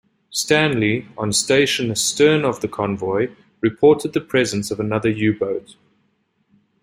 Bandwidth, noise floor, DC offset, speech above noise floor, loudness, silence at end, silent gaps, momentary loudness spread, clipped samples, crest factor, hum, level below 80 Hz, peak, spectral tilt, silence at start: 16 kHz; -66 dBFS; under 0.1%; 47 dB; -19 LUFS; 1.2 s; none; 8 LU; under 0.1%; 18 dB; none; -56 dBFS; -2 dBFS; -4 dB/octave; 0.3 s